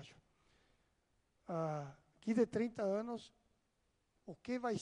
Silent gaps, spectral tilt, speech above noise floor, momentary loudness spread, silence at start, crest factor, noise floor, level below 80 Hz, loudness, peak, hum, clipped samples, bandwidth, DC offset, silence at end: none; -7 dB/octave; 42 dB; 22 LU; 0 s; 20 dB; -81 dBFS; -78 dBFS; -40 LUFS; -22 dBFS; none; under 0.1%; 10.5 kHz; under 0.1%; 0 s